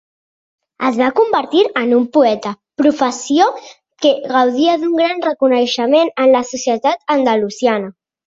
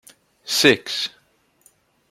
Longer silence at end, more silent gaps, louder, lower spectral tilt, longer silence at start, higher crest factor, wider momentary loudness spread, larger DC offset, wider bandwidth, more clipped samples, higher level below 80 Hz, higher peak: second, 0.35 s vs 1.05 s; neither; first, -15 LUFS vs -19 LUFS; about the same, -3.5 dB/octave vs -2.5 dB/octave; first, 0.8 s vs 0.45 s; second, 14 dB vs 22 dB; second, 6 LU vs 15 LU; neither; second, 7.8 kHz vs 16.5 kHz; neither; about the same, -62 dBFS vs -64 dBFS; about the same, 0 dBFS vs -2 dBFS